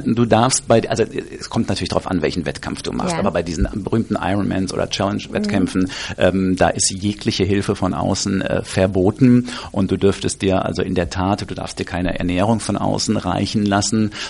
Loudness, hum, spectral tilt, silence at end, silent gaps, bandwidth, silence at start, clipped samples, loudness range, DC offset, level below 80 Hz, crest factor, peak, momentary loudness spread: -19 LUFS; none; -5 dB/octave; 0 s; none; 11.5 kHz; 0 s; under 0.1%; 3 LU; under 0.1%; -38 dBFS; 18 dB; 0 dBFS; 8 LU